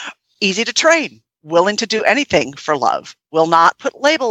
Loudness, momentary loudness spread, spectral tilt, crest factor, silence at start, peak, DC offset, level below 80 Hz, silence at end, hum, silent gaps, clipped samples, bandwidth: -15 LUFS; 8 LU; -3 dB/octave; 16 dB; 0 s; 0 dBFS; under 0.1%; -56 dBFS; 0 s; none; none; under 0.1%; 11.5 kHz